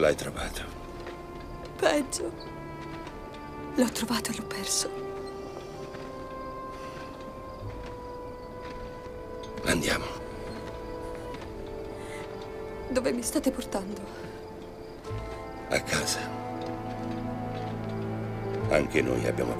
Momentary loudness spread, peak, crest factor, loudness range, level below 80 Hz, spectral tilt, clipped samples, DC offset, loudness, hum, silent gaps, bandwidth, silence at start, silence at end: 14 LU; -10 dBFS; 22 dB; 8 LU; -48 dBFS; -4 dB/octave; under 0.1%; under 0.1%; -33 LUFS; none; none; 16 kHz; 0 s; 0 s